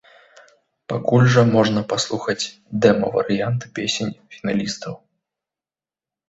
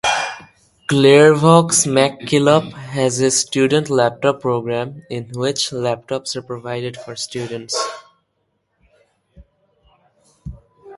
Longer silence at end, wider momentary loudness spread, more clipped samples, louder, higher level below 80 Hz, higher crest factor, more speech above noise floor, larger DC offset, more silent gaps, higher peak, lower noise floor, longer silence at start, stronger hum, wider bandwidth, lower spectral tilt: first, 1.35 s vs 0 s; second, 14 LU vs 17 LU; neither; second, -20 LUFS vs -17 LUFS; about the same, -56 dBFS vs -52 dBFS; about the same, 20 dB vs 18 dB; first, over 71 dB vs 53 dB; neither; neither; about the same, -2 dBFS vs 0 dBFS; first, under -90 dBFS vs -69 dBFS; first, 0.9 s vs 0.05 s; neither; second, 8 kHz vs 11.5 kHz; first, -5.5 dB/octave vs -4 dB/octave